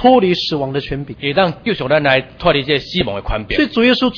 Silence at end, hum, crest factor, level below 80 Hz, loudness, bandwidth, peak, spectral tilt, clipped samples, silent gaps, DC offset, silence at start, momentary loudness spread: 0 s; none; 16 dB; -34 dBFS; -16 LUFS; 5.4 kHz; 0 dBFS; -6.5 dB/octave; under 0.1%; none; under 0.1%; 0 s; 8 LU